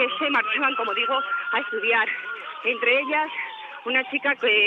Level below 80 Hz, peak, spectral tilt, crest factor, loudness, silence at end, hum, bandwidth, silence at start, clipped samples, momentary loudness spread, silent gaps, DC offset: -88 dBFS; -8 dBFS; -3.5 dB/octave; 16 dB; -23 LUFS; 0 s; none; 6.8 kHz; 0 s; under 0.1%; 10 LU; none; under 0.1%